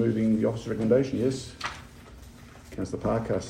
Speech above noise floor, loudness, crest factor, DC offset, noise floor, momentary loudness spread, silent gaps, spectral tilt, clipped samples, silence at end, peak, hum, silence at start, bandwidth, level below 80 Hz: 21 dB; -28 LUFS; 18 dB; under 0.1%; -47 dBFS; 24 LU; none; -7 dB/octave; under 0.1%; 0 s; -10 dBFS; none; 0 s; 14 kHz; -50 dBFS